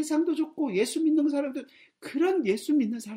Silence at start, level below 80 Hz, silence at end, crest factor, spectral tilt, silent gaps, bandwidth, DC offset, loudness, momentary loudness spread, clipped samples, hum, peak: 0 s; -76 dBFS; 0 s; 14 dB; -5 dB/octave; none; 16 kHz; under 0.1%; -27 LUFS; 11 LU; under 0.1%; none; -14 dBFS